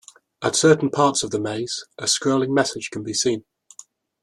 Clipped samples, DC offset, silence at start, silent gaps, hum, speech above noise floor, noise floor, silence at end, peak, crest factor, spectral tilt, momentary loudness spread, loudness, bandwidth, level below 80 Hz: under 0.1%; under 0.1%; 0.4 s; none; none; 28 dB; -49 dBFS; 0.8 s; -2 dBFS; 20 dB; -3.5 dB/octave; 11 LU; -21 LUFS; 13 kHz; -62 dBFS